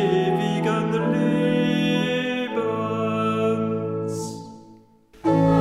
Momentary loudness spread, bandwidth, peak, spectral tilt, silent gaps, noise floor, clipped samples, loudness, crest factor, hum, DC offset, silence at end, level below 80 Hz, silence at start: 7 LU; 12 kHz; -6 dBFS; -6.5 dB/octave; none; -51 dBFS; under 0.1%; -23 LUFS; 16 dB; none; under 0.1%; 0 s; -54 dBFS; 0 s